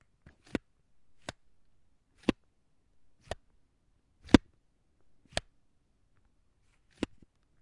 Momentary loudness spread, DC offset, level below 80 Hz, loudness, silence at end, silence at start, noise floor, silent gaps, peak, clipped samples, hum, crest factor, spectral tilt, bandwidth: 22 LU; under 0.1%; -50 dBFS; -32 LUFS; 3.25 s; 2.3 s; -72 dBFS; none; -2 dBFS; under 0.1%; none; 34 dB; -5.5 dB/octave; 11.5 kHz